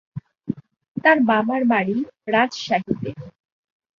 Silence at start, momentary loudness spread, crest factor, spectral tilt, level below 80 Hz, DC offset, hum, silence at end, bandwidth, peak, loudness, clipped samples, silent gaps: 0.15 s; 18 LU; 20 dB; -6 dB/octave; -60 dBFS; under 0.1%; none; 0.7 s; 7.2 kHz; -2 dBFS; -20 LUFS; under 0.1%; 0.88-0.95 s